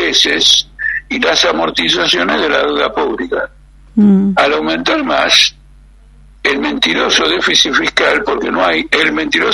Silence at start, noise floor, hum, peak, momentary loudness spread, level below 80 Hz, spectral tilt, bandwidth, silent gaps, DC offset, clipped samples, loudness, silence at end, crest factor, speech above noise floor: 0 s; -41 dBFS; none; 0 dBFS; 9 LU; -40 dBFS; -3 dB/octave; 12 kHz; none; under 0.1%; under 0.1%; -12 LUFS; 0 s; 14 dB; 28 dB